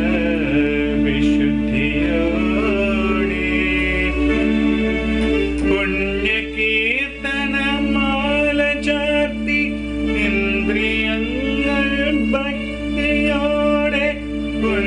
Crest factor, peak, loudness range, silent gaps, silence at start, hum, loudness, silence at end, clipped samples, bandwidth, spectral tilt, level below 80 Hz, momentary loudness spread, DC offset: 12 dB; -6 dBFS; 1 LU; none; 0 s; none; -18 LUFS; 0 s; under 0.1%; 10 kHz; -6 dB/octave; -30 dBFS; 4 LU; under 0.1%